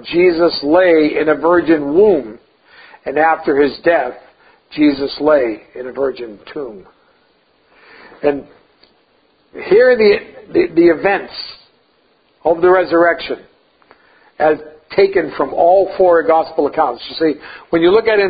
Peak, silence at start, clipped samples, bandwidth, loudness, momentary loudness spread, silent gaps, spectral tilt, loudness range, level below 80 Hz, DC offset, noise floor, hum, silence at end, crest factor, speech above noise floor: 0 dBFS; 0.05 s; under 0.1%; 5 kHz; -14 LUFS; 16 LU; none; -10 dB/octave; 7 LU; -50 dBFS; under 0.1%; -56 dBFS; none; 0 s; 14 dB; 43 dB